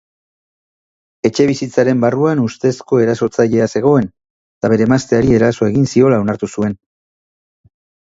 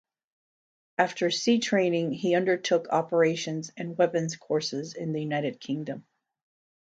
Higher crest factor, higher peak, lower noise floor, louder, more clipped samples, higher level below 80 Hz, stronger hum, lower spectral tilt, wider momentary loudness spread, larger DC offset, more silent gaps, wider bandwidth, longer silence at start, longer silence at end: about the same, 16 dB vs 20 dB; first, 0 dBFS vs -8 dBFS; about the same, under -90 dBFS vs under -90 dBFS; first, -14 LUFS vs -27 LUFS; neither; first, -44 dBFS vs -76 dBFS; neither; first, -7 dB/octave vs -5 dB/octave; second, 7 LU vs 10 LU; neither; first, 4.30-4.61 s vs none; second, 8 kHz vs 9.2 kHz; first, 1.25 s vs 1 s; first, 1.35 s vs 0.95 s